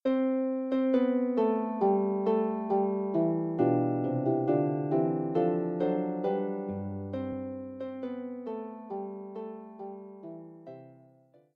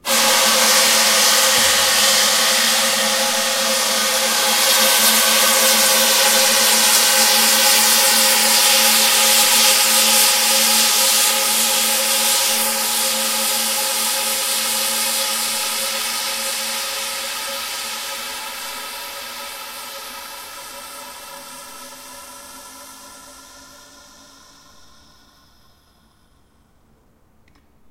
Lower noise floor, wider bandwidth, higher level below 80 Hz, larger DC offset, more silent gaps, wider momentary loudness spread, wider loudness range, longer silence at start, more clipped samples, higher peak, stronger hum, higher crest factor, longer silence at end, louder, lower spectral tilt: first, -61 dBFS vs -56 dBFS; second, 5 kHz vs 16 kHz; second, -78 dBFS vs -58 dBFS; neither; neither; second, 16 LU vs 19 LU; second, 12 LU vs 19 LU; about the same, 0.05 s vs 0.05 s; neither; second, -14 dBFS vs 0 dBFS; neither; about the same, 16 dB vs 18 dB; second, 0.6 s vs 4.55 s; second, -30 LUFS vs -13 LUFS; first, -11 dB/octave vs 1.5 dB/octave